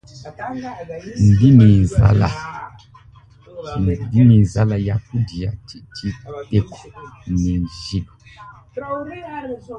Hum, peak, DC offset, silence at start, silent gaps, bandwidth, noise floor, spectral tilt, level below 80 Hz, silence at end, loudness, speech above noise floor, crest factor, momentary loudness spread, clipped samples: none; 0 dBFS; under 0.1%; 0.15 s; none; 8.8 kHz; -46 dBFS; -8.5 dB/octave; -34 dBFS; 0 s; -17 LUFS; 29 dB; 18 dB; 22 LU; under 0.1%